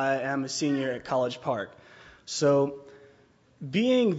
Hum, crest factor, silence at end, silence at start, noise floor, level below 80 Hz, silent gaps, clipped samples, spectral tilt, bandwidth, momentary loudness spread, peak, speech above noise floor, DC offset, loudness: none; 16 dB; 0 s; 0 s; -60 dBFS; -68 dBFS; none; under 0.1%; -5 dB/octave; 8 kHz; 17 LU; -12 dBFS; 34 dB; under 0.1%; -27 LUFS